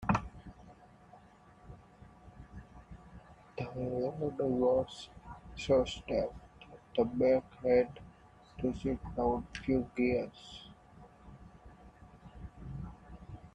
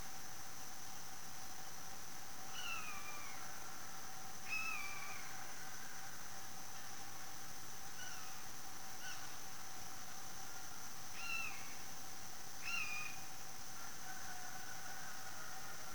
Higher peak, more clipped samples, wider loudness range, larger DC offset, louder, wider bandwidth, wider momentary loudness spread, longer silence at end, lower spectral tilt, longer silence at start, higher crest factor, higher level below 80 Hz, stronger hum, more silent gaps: first, -16 dBFS vs -30 dBFS; neither; first, 14 LU vs 4 LU; second, under 0.1% vs 0.8%; first, -34 LUFS vs -48 LUFS; second, 9.6 kHz vs over 20 kHz; first, 26 LU vs 7 LU; about the same, 0.05 s vs 0 s; first, -7 dB/octave vs -1 dB/octave; about the same, 0 s vs 0 s; about the same, 20 dB vs 18 dB; first, -54 dBFS vs -72 dBFS; neither; neither